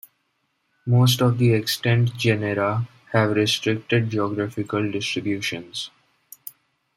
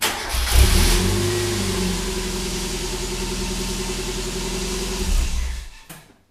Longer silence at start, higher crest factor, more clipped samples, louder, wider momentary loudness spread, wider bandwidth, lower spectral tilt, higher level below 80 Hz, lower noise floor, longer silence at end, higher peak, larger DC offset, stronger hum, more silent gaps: first, 0.85 s vs 0 s; about the same, 18 dB vs 20 dB; neither; about the same, -22 LUFS vs -22 LUFS; first, 15 LU vs 12 LU; about the same, 16 kHz vs 16 kHz; first, -5.5 dB/octave vs -3.5 dB/octave; second, -60 dBFS vs -24 dBFS; first, -71 dBFS vs -44 dBFS; first, 0.45 s vs 0.3 s; about the same, -4 dBFS vs -2 dBFS; neither; neither; neither